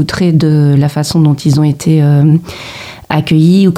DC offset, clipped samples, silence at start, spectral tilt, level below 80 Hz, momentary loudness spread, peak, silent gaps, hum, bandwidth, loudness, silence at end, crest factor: under 0.1%; under 0.1%; 0 s; -7 dB/octave; -40 dBFS; 14 LU; 0 dBFS; none; none; 14 kHz; -10 LUFS; 0 s; 10 dB